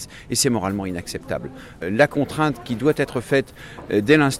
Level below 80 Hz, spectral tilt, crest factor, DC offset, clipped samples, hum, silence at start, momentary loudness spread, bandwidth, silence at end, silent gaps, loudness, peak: -48 dBFS; -4.5 dB/octave; 18 dB; under 0.1%; under 0.1%; none; 0 s; 12 LU; 15.5 kHz; 0 s; none; -22 LUFS; -4 dBFS